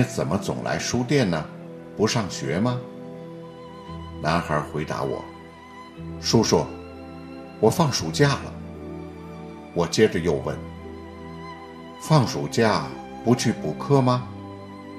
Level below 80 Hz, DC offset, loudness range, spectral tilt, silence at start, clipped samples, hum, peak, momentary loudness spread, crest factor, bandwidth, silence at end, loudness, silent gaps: -52 dBFS; under 0.1%; 5 LU; -5.5 dB/octave; 0 s; under 0.1%; none; -2 dBFS; 19 LU; 22 dB; 14.5 kHz; 0 s; -23 LUFS; none